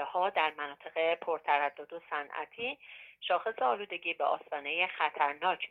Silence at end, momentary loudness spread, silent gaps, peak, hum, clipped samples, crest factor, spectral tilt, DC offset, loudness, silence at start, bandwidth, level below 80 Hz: 0.05 s; 10 LU; none; -14 dBFS; none; under 0.1%; 20 dB; -5 dB/octave; under 0.1%; -33 LUFS; 0 s; 5 kHz; -82 dBFS